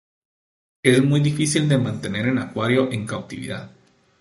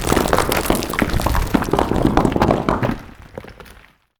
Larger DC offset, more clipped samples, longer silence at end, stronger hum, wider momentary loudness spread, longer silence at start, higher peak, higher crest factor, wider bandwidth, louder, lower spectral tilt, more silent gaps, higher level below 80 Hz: neither; neither; about the same, 0.5 s vs 0.45 s; neither; second, 14 LU vs 18 LU; first, 0.85 s vs 0 s; about the same, -2 dBFS vs -2 dBFS; about the same, 20 dB vs 18 dB; second, 11.5 kHz vs over 20 kHz; second, -21 LUFS vs -18 LUFS; about the same, -5.5 dB/octave vs -5.5 dB/octave; neither; second, -56 dBFS vs -28 dBFS